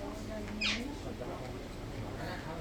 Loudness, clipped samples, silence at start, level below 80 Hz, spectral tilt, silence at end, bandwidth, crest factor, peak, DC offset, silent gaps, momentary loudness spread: -39 LUFS; under 0.1%; 0 s; -48 dBFS; -4.5 dB/octave; 0 s; 19.5 kHz; 18 dB; -20 dBFS; under 0.1%; none; 10 LU